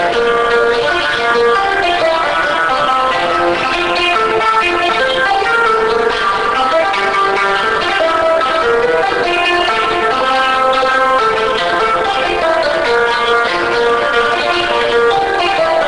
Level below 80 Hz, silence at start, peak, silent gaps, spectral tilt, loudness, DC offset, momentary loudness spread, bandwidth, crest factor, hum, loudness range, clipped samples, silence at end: -40 dBFS; 0 s; -2 dBFS; none; -3 dB/octave; -12 LUFS; under 0.1%; 2 LU; 10 kHz; 10 dB; none; 0 LU; under 0.1%; 0 s